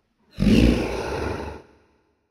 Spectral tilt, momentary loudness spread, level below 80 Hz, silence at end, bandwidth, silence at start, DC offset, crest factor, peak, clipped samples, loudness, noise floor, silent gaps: -7 dB/octave; 18 LU; -30 dBFS; 0.7 s; 13.5 kHz; 0.35 s; under 0.1%; 20 dB; -4 dBFS; under 0.1%; -22 LUFS; -63 dBFS; none